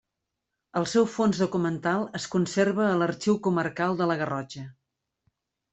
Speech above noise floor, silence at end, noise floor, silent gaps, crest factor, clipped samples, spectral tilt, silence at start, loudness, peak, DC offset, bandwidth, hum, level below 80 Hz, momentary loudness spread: 58 dB; 1 s; -84 dBFS; none; 16 dB; under 0.1%; -6 dB/octave; 0.75 s; -26 LUFS; -10 dBFS; under 0.1%; 8.4 kHz; none; -64 dBFS; 9 LU